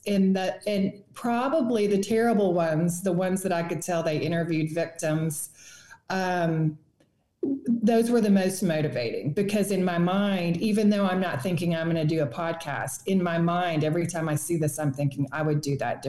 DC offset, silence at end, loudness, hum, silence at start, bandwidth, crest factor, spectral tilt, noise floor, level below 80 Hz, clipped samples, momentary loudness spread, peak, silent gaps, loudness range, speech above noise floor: 0.2%; 0 s; -26 LUFS; none; 0.05 s; 12.5 kHz; 12 dB; -6 dB/octave; -67 dBFS; -64 dBFS; under 0.1%; 7 LU; -12 dBFS; none; 4 LU; 42 dB